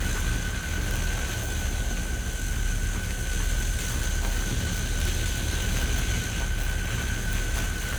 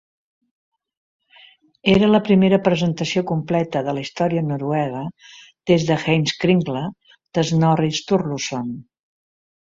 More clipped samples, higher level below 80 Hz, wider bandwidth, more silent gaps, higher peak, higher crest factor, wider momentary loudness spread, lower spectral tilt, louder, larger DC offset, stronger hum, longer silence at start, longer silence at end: neither; first, -28 dBFS vs -52 dBFS; first, over 20 kHz vs 7.8 kHz; neither; second, -12 dBFS vs -2 dBFS; about the same, 14 dB vs 18 dB; second, 3 LU vs 13 LU; second, -3.5 dB/octave vs -6 dB/octave; second, -29 LUFS vs -19 LUFS; neither; neither; second, 0 s vs 1.85 s; second, 0 s vs 0.9 s